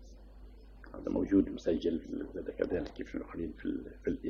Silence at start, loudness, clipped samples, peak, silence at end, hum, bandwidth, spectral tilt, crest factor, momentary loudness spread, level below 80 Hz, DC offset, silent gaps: 0 s; -35 LUFS; under 0.1%; -16 dBFS; 0 s; none; 7.2 kHz; -7.5 dB/octave; 20 dB; 23 LU; -52 dBFS; under 0.1%; none